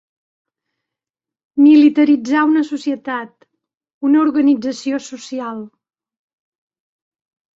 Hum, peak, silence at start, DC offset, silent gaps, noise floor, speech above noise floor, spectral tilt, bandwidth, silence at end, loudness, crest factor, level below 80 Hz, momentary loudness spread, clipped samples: none; -2 dBFS; 1.55 s; under 0.1%; 3.94-4.01 s; -88 dBFS; 73 dB; -4.5 dB/octave; 7.8 kHz; 1.9 s; -15 LUFS; 16 dB; -66 dBFS; 16 LU; under 0.1%